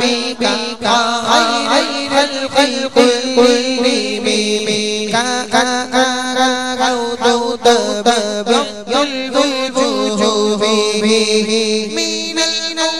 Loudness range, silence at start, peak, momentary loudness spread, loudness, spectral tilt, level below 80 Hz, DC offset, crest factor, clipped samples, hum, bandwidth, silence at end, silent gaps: 2 LU; 0 s; 0 dBFS; 4 LU; -14 LUFS; -2.5 dB/octave; -52 dBFS; 1%; 14 dB; under 0.1%; none; 14 kHz; 0 s; none